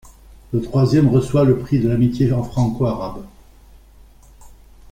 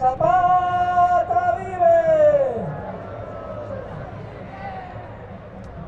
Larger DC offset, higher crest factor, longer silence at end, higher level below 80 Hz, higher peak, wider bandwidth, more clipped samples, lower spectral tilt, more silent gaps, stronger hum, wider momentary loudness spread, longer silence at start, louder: neither; about the same, 16 dB vs 14 dB; first, 0.4 s vs 0 s; first, -40 dBFS vs -46 dBFS; about the same, -4 dBFS vs -6 dBFS; first, 10 kHz vs 7.6 kHz; neither; about the same, -8.5 dB/octave vs -7.5 dB/octave; neither; neither; second, 11 LU vs 20 LU; about the same, 0.05 s vs 0 s; about the same, -18 LUFS vs -18 LUFS